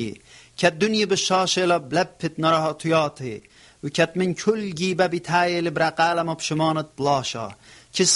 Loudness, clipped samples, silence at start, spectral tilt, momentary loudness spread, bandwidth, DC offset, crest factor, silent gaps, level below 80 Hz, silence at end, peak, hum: -22 LUFS; under 0.1%; 0 s; -3.5 dB/octave; 12 LU; 11.5 kHz; under 0.1%; 20 dB; none; -60 dBFS; 0 s; -4 dBFS; none